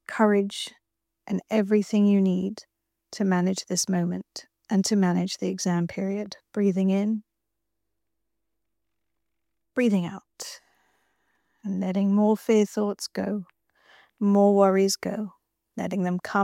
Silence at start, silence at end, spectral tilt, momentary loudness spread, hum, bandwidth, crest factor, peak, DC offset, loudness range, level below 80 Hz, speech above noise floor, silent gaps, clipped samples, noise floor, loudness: 0.1 s; 0 s; -5.5 dB/octave; 16 LU; none; 15 kHz; 18 dB; -8 dBFS; under 0.1%; 8 LU; -74 dBFS; 60 dB; none; under 0.1%; -84 dBFS; -25 LUFS